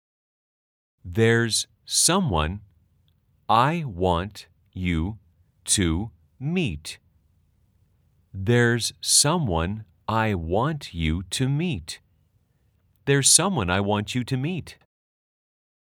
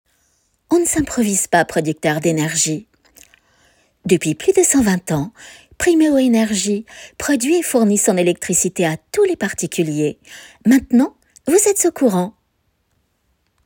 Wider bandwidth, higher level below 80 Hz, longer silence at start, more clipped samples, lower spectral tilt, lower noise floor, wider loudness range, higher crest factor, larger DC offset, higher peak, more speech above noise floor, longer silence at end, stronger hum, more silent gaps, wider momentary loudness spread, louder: about the same, 19 kHz vs 18 kHz; about the same, -46 dBFS vs -48 dBFS; first, 1.05 s vs 0.7 s; neither; about the same, -3.5 dB/octave vs -4 dB/octave; about the same, -65 dBFS vs -66 dBFS; first, 5 LU vs 2 LU; first, 24 dB vs 16 dB; neither; about the same, -2 dBFS vs -2 dBFS; second, 42 dB vs 50 dB; second, 1.1 s vs 1.35 s; neither; neither; first, 18 LU vs 9 LU; second, -23 LUFS vs -16 LUFS